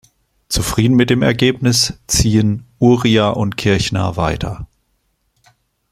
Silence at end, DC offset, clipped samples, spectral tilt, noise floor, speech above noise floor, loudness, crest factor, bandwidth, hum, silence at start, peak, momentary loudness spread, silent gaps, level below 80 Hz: 1.25 s; under 0.1%; under 0.1%; -5 dB/octave; -65 dBFS; 50 dB; -15 LUFS; 16 dB; 16 kHz; none; 0.5 s; 0 dBFS; 7 LU; none; -34 dBFS